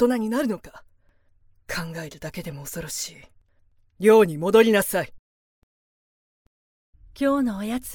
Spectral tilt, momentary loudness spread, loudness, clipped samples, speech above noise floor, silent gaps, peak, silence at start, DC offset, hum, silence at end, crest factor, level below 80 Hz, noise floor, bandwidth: -5 dB/octave; 17 LU; -22 LUFS; under 0.1%; 38 dB; 5.19-6.93 s; -4 dBFS; 0 s; under 0.1%; none; 0 s; 20 dB; -54 dBFS; -60 dBFS; 18 kHz